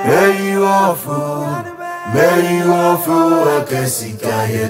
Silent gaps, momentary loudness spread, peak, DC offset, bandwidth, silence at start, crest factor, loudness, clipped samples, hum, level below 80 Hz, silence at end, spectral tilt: none; 9 LU; -2 dBFS; under 0.1%; 16.5 kHz; 0 s; 14 dB; -14 LUFS; under 0.1%; none; -56 dBFS; 0 s; -5.5 dB/octave